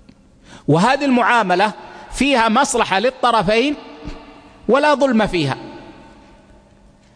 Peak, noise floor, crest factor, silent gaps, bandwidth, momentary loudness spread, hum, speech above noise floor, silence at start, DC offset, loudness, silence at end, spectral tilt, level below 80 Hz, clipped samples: 0 dBFS; -49 dBFS; 18 dB; none; 10.5 kHz; 17 LU; none; 33 dB; 0.7 s; under 0.1%; -16 LUFS; 1.25 s; -4.5 dB/octave; -42 dBFS; under 0.1%